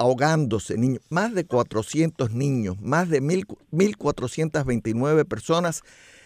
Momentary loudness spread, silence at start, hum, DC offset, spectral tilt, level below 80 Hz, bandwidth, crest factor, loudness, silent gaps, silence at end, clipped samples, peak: 5 LU; 0 s; none; under 0.1%; -6 dB/octave; -54 dBFS; 15.5 kHz; 18 dB; -24 LUFS; none; 0.45 s; under 0.1%; -6 dBFS